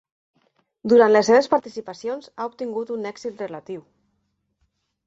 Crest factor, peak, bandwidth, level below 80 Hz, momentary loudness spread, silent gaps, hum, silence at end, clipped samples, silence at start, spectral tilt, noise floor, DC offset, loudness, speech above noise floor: 18 dB; -4 dBFS; 7.8 kHz; -68 dBFS; 20 LU; none; none; 1.25 s; under 0.1%; 0.85 s; -4.5 dB/octave; -72 dBFS; under 0.1%; -21 LUFS; 52 dB